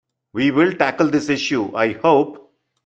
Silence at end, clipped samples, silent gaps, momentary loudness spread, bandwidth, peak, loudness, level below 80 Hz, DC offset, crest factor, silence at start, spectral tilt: 0.45 s; under 0.1%; none; 5 LU; 8.2 kHz; -2 dBFS; -18 LUFS; -60 dBFS; under 0.1%; 18 dB; 0.35 s; -5.5 dB/octave